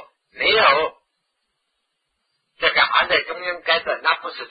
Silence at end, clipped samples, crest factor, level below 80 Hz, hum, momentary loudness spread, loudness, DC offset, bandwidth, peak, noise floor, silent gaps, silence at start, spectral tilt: 0.05 s; under 0.1%; 20 dB; -56 dBFS; none; 10 LU; -18 LUFS; under 0.1%; 5 kHz; -2 dBFS; -74 dBFS; none; 0 s; -5 dB/octave